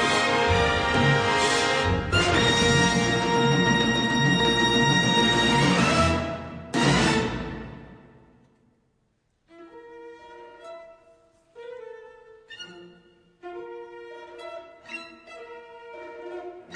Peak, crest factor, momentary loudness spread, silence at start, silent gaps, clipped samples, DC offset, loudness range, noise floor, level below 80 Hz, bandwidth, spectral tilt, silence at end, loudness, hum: -8 dBFS; 16 dB; 23 LU; 0 s; none; under 0.1%; under 0.1%; 23 LU; -70 dBFS; -44 dBFS; 11 kHz; -4 dB/octave; 0 s; -21 LUFS; none